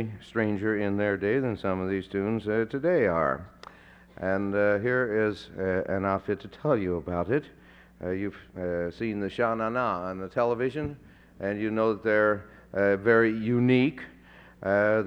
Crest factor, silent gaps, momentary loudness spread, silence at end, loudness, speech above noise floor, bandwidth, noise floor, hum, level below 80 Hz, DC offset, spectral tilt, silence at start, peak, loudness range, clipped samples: 18 dB; none; 10 LU; 0 s; -27 LUFS; 26 dB; 8.8 kHz; -52 dBFS; none; -56 dBFS; under 0.1%; -8.5 dB/octave; 0 s; -10 dBFS; 5 LU; under 0.1%